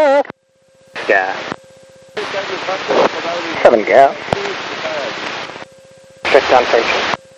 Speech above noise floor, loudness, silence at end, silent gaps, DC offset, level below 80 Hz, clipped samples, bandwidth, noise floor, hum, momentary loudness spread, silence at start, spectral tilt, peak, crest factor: 40 dB; -15 LUFS; 0.2 s; none; under 0.1%; -50 dBFS; 0.2%; 10 kHz; -54 dBFS; none; 16 LU; 0 s; -3.5 dB/octave; 0 dBFS; 16 dB